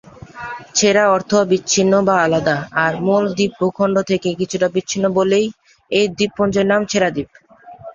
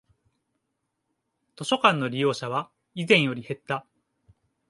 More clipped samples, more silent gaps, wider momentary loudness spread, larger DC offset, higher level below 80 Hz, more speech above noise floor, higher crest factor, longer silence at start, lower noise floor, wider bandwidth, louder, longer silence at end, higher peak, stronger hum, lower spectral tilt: neither; neither; second, 7 LU vs 14 LU; neither; first, -52 dBFS vs -72 dBFS; second, 21 dB vs 55 dB; second, 16 dB vs 24 dB; second, 0.35 s vs 1.6 s; second, -38 dBFS vs -79 dBFS; second, 7.6 kHz vs 11.5 kHz; first, -16 LUFS vs -25 LUFS; second, 0 s vs 0.9 s; about the same, -2 dBFS vs -4 dBFS; neither; about the same, -4 dB/octave vs -5 dB/octave